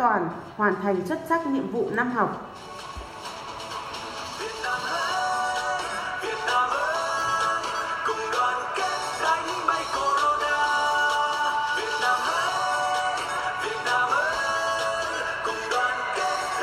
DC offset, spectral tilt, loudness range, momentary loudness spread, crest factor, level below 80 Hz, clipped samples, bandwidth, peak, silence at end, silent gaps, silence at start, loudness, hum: under 0.1%; -2.5 dB/octave; 6 LU; 11 LU; 18 dB; -56 dBFS; under 0.1%; 16 kHz; -8 dBFS; 0 s; none; 0 s; -25 LUFS; none